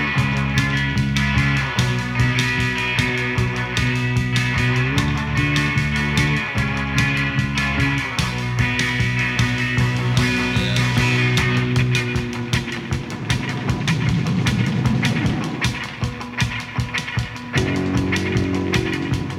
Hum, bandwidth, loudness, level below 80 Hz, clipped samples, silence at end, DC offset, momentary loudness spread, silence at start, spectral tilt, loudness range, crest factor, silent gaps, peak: none; 14.5 kHz; -20 LUFS; -34 dBFS; under 0.1%; 0 s; under 0.1%; 5 LU; 0 s; -5 dB/octave; 3 LU; 18 dB; none; -2 dBFS